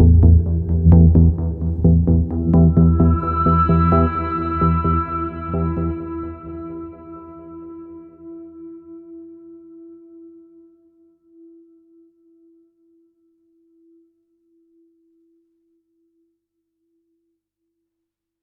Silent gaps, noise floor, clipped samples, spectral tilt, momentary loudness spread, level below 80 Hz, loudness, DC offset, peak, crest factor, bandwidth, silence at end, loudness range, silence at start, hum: none; -81 dBFS; under 0.1%; -13 dB/octave; 25 LU; -26 dBFS; -16 LUFS; under 0.1%; 0 dBFS; 18 dB; 4.2 kHz; 8.85 s; 25 LU; 0 s; 50 Hz at -50 dBFS